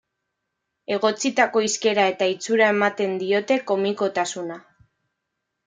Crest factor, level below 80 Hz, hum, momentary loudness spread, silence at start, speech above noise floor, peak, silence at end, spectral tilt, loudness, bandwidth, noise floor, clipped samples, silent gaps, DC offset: 20 dB; -74 dBFS; none; 10 LU; 0.9 s; 58 dB; -4 dBFS; 1.05 s; -3 dB/octave; -21 LUFS; 9.6 kHz; -80 dBFS; under 0.1%; none; under 0.1%